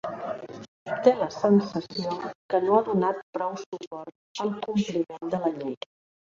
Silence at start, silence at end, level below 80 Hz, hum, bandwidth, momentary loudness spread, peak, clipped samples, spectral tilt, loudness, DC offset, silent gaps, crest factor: 0.05 s; 0.6 s; -70 dBFS; none; 7.6 kHz; 18 LU; -6 dBFS; under 0.1%; -6.5 dB/octave; -27 LUFS; under 0.1%; 0.68-0.86 s, 2.35-2.49 s, 3.23-3.33 s, 3.66-3.72 s, 3.87-3.91 s, 4.15-4.35 s; 22 dB